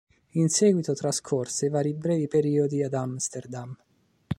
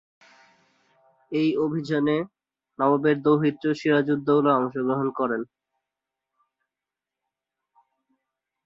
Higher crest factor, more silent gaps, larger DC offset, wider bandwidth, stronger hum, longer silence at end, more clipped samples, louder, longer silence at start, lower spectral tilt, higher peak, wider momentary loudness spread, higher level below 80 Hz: about the same, 16 dB vs 18 dB; neither; neither; first, 14.5 kHz vs 7.4 kHz; second, none vs 50 Hz at -50 dBFS; second, 0.05 s vs 3.2 s; neither; second, -26 LUFS vs -23 LUFS; second, 0.35 s vs 1.3 s; second, -5.5 dB/octave vs -8 dB/octave; about the same, -10 dBFS vs -8 dBFS; first, 13 LU vs 7 LU; first, -60 dBFS vs -70 dBFS